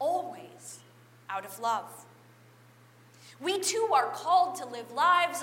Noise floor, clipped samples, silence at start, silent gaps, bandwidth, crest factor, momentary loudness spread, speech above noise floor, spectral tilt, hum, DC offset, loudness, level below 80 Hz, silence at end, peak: -57 dBFS; under 0.1%; 0 s; none; 16 kHz; 18 dB; 21 LU; 29 dB; -1.5 dB/octave; none; under 0.1%; -29 LUFS; -88 dBFS; 0 s; -12 dBFS